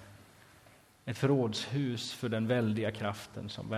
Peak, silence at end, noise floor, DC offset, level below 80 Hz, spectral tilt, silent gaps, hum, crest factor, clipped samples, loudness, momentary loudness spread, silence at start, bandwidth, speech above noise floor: -16 dBFS; 0 s; -61 dBFS; under 0.1%; -64 dBFS; -6 dB/octave; none; none; 18 dB; under 0.1%; -33 LUFS; 13 LU; 0 s; 15.5 kHz; 28 dB